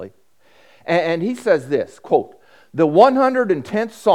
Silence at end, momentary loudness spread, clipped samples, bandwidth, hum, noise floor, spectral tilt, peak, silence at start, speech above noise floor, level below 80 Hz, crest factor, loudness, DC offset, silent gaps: 0 s; 17 LU; under 0.1%; 14 kHz; none; -57 dBFS; -6.5 dB/octave; 0 dBFS; 0 s; 40 dB; -68 dBFS; 18 dB; -18 LUFS; 0.2%; none